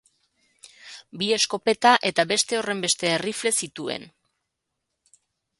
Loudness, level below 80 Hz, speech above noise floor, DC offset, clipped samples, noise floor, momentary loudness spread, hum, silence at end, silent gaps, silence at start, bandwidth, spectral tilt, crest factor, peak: -22 LUFS; -70 dBFS; 57 dB; under 0.1%; under 0.1%; -81 dBFS; 16 LU; none; 1.5 s; none; 0.85 s; 12 kHz; -2 dB/octave; 24 dB; -2 dBFS